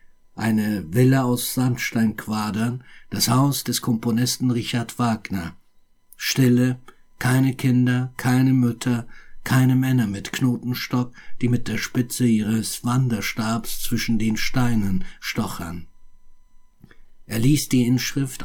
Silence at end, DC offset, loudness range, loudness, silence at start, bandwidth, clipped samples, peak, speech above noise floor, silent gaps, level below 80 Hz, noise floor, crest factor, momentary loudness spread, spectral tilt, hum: 0 s; under 0.1%; 4 LU; -22 LUFS; 0.35 s; 18.5 kHz; under 0.1%; -6 dBFS; 34 dB; none; -40 dBFS; -55 dBFS; 16 dB; 9 LU; -5.5 dB/octave; none